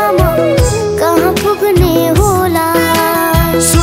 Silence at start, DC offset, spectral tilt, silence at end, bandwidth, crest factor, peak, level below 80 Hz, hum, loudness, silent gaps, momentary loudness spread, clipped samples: 0 s; under 0.1%; -5 dB/octave; 0 s; 16.5 kHz; 10 dB; 0 dBFS; -22 dBFS; none; -11 LUFS; none; 2 LU; 0.2%